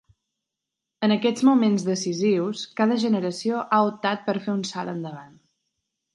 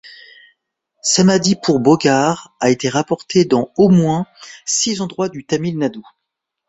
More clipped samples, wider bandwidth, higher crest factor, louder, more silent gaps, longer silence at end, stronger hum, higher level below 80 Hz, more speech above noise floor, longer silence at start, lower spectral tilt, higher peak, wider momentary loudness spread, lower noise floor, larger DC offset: neither; first, 11.5 kHz vs 8.2 kHz; about the same, 18 dB vs 16 dB; second, -23 LUFS vs -16 LUFS; neither; first, 0.9 s vs 0.65 s; neither; second, -72 dBFS vs -54 dBFS; about the same, 62 dB vs 63 dB; first, 1 s vs 0.05 s; about the same, -5.5 dB/octave vs -4.5 dB/octave; second, -6 dBFS vs -2 dBFS; about the same, 11 LU vs 10 LU; first, -85 dBFS vs -78 dBFS; neither